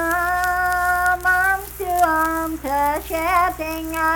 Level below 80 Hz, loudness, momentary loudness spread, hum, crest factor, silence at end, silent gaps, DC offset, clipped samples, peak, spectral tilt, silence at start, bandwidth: -38 dBFS; -19 LUFS; 7 LU; none; 14 dB; 0 s; none; under 0.1%; under 0.1%; -6 dBFS; -3.5 dB/octave; 0 s; 19 kHz